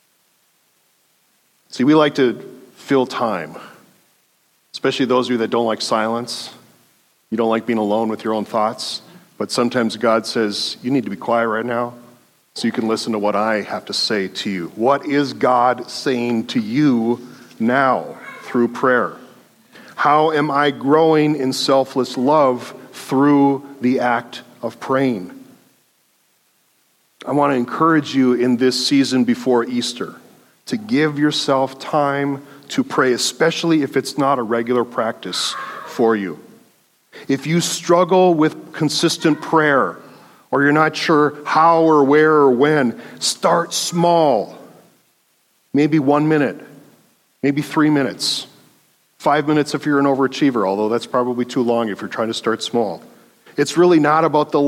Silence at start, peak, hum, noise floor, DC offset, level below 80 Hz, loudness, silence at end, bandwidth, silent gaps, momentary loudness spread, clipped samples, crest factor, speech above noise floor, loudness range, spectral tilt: 1.75 s; -2 dBFS; none; -61 dBFS; under 0.1%; -70 dBFS; -17 LUFS; 0 s; 15.5 kHz; none; 12 LU; under 0.1%; 18 dB; 45 dB; 6 LU; -5 dB/octave